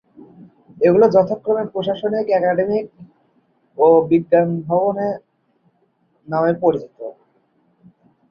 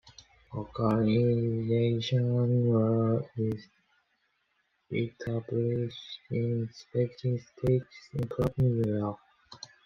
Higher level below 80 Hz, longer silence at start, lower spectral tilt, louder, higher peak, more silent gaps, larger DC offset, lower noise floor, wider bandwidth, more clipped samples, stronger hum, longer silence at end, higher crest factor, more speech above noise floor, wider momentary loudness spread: about the same, -60 dBFS vs -56 dBFS; first, 0.2 s vs 0.05 s; about the same, -9 dB/octave vs -8.5 dB/octave; first, -17 LUFS vs -30 LUFS; first, -2 dBFS vs -12 dBFS; neither; neither; second, -63 dBFS vs -75 dBFS; about the same, 6.4 kHz vs 6.4 kHz; neither; neither; first, 1.2 s vs 0.3 s; about the same, 18 dB vs 16 dB; about the same, 46 dB vs 47 dB; first, 17 LU vs 13 LU